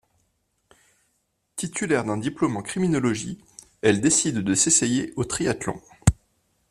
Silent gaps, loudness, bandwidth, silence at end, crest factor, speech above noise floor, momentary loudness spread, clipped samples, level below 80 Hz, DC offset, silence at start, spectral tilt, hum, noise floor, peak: none; -23 LUFS; 14.5 kHz; 0.55 s; 22 dB; 49 dB; 14 LU; under 0.1%; -44 dBFS; under 0.1%; 1.55 s; -4 dB/octave; none; -72 dBFS; -2 dBFS